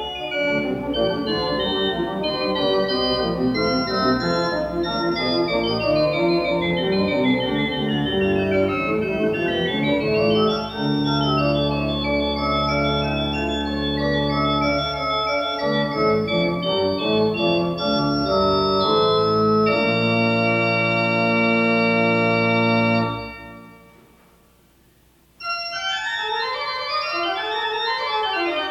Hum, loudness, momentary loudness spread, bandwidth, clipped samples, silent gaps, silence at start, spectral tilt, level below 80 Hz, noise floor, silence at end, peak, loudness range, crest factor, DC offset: none; -20 LUFS; 5 LU; 15.5 kHz; under 0.1%; none; 0 s; -6.5 dB/octave; -42 dBFS; -56 dBFS; 0 s; -6 dBFS; 6 LU; 14 dB; under 0.1%